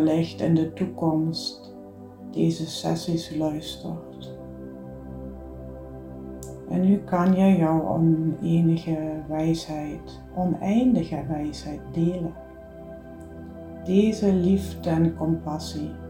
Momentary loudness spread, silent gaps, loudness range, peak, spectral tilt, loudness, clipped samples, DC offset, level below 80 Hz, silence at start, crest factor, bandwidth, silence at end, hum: 19 LU; none; 9 LU; -8 dBFS; -7.5 dB/octave; -24 LUFS; under 0.1%; under 0.1%; -48 dBFS; 0 s; 18 dB; 16 kHz; 0 s; none